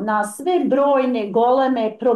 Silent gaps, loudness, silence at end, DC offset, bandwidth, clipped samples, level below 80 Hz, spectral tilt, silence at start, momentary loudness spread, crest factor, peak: none; -18 LUFS; 0 s; under 0.1%; 12.5 kHz; under 0.1%; -64 dBFS; -5.5 dB/octave; 0 s; 4 LU; 10 dB; -8 dBFS